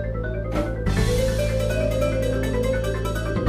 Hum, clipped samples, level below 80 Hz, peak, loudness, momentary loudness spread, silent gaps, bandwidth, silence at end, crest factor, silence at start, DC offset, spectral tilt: none; under 0.1%; -28 dBFS; -8 dBFS; -24 LUFS; 4 LU; none; 15.5 kHz; 0 s; 14 dB; 0 s; under 0.1%; -6 dB/octave